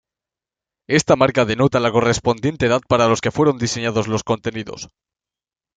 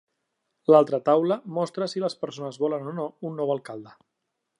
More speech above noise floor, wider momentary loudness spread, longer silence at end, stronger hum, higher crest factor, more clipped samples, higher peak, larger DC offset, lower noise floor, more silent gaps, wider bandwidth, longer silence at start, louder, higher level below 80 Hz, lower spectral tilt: first, over 72 dB vs 56 dB; second, 11 LU vs 14 LU; first, 0.9 s vs 0.7 s; neither; about the same, 18 dB vs 22 dB; neither; about the same, -2 dBFS vs -4 dBFS; neither; first, under -90 dBFS vs -80 dBFS; neither; second, 9.4 kHz vs 11 kHz; first, 0.9 s vs 0.7 s; first, -18 LUFS vs -25 LUFS; first, -48 dBFS vs -82 dBFS; second, -5 dB/octave vs -7 dB/octave